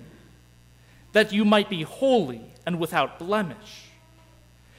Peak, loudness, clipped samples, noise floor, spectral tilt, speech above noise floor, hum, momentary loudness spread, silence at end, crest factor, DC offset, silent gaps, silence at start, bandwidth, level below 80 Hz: -8 dBFS; -24 LUFS; under 0.1%; -54 dBFS; -5.5 dB/octave; 30 dB; 60 Hz at -50 dBFS; 15 LU; 1 s; 18 dB; under 0.1%; none; 0 s; 16 kHz; -58 dBFS